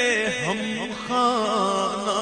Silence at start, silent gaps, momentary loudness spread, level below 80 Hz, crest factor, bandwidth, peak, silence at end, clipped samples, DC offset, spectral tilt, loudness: 0 s; none; 6 LU; -56 dBFS; 14 dB; 10 kHz; -8 dBFS; 0 s; under 0.1%; under 0.1%; -3.5 dB/octave; -23 LUFS